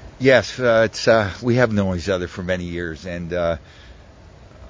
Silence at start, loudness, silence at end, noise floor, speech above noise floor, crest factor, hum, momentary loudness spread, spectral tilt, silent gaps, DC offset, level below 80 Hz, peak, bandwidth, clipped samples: 0 s; -20 LUFS; 0 s; -44 dBFS; 25 dB; 18 dB; none; 12 LU; -5.5 dB/octave; none; under 0.1%; -40 dBFS; -2 dBFS; 8 kHz; under 0.1%